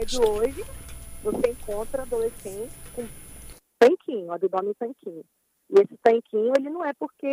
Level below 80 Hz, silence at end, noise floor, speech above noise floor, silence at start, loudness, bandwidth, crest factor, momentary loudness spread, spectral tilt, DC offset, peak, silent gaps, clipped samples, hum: -44 dBFS; 0 s; -45 dBFS; 20 dB; 0 s; -24 LUFS; 15.5 kHz; 22 dB; 20 LU; -4.5 dB/octave; under 0.1%; -2 dBFS; none; under 0.1%; none